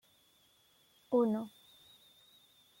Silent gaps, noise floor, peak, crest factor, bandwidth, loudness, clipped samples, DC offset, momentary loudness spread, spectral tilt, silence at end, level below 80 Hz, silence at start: none; -69 dBFS; -20 dBFS; 20 dB; 16.5 kHz; -34 LUFS; under 0.1%; under 0.1%; 28 LU; -7.5 dB/octave; 1.3 s; -84 dBFS; 1.1 s